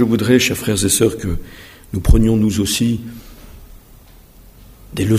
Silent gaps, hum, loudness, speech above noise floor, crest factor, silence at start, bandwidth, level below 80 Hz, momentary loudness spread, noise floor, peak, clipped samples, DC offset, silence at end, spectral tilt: none; none; -16 LUFS; 28 dB; 18 dB; 0 s; 16 kHz; -26 dBFS; 16 LU; -43 dBFS; 0 dBFS; under 0.1%; under 0.1%; 0 s; -5 dB/octave